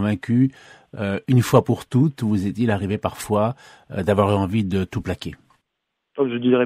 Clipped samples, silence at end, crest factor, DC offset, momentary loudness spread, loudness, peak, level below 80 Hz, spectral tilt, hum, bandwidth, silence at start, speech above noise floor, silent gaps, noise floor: under 0.1%; 0 s; 20 dB; under 0.1%; 12 LU; -21 LUFS; 0 dBFS; -50 dBFS; -7.5 dB/octave; none; 15.5 kHz; 0 s; 58 dB; none; -78 dBFS